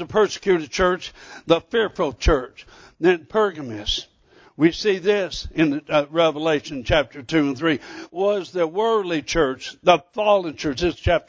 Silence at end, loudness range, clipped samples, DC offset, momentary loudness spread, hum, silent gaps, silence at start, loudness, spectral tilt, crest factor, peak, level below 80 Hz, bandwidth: 0.1 s; 2 LU; under 0.1%; under 0.1%; 6 LU; none; none; 0 s; -21 LUFS; -5 dB/octave; 20 dB; -2 dBFS; -36 dBFS; 8 kHz